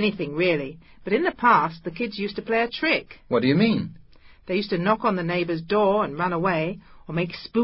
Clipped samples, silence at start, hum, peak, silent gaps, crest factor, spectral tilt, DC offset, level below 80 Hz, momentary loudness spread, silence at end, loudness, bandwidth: under 0.1%; 0 s; none; -6 dBFS; none; 18 dB; -10.5 dB/octave; under 0.1%; -56 dBFS; 10 LU; 0 s; -23 LUFS; 5.8 kHz